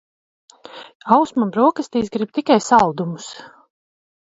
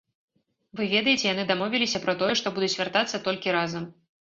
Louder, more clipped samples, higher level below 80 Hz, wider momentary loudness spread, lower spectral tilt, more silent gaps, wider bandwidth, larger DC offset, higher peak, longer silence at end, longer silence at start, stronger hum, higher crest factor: first, -18 LUFS vs -25 LUFS; neither; first, -58 dBFS vs -66 dBFS; first, 21 LU vs 9 LU; first, -5.5 dB/octave vs -3.5 dB/octave; first, 0.95-1.00 s vs none; about the same, 8 kHz vs 7.8 kHz; neither; first, 0 dBFS vs -6 dBFS; first, 0.85 s vs 0.3 s; about the same, 0.75 s vs 0.75 s; neither; about the same, 20 dB vs 20 dB